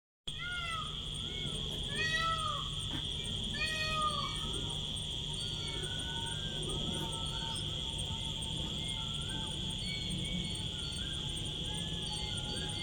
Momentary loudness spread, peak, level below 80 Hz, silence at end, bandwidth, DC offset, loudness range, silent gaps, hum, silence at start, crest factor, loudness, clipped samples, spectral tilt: 4 LU; -22 dBFS; -48 dBFS; 0 s; 19 kHz; under 0.1%; 2 LU; none; none; 0.25 s; 16 dB; -36 LUFS; under 0.1%; -3 dB/octave